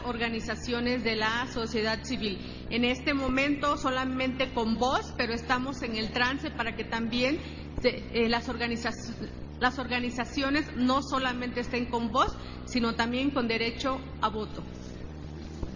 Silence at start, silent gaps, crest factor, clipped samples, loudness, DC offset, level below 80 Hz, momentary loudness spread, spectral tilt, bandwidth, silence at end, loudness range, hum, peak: 0 s; none; 20 dB; under 0.1%; -29 LUFS; under 0.1%; -44 dBFS; 11 LU; -5 dB/octave; 7.4 kHz; 0 s; 2 LU; none; -10 dBFS